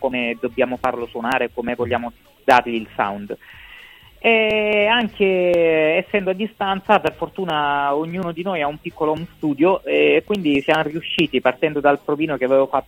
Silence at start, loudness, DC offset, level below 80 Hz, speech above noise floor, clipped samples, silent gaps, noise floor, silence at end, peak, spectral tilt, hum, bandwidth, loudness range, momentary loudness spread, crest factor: 0 s; -19 LUFS; under 0.1%; -52 dBFS; 25 dB; under 0.1%; none; -44 dBFS; 0.05 s; 0 dBFS; -6 dB/octave; none; 16.5 kHz; 3 LU; 9 LU; 20 dB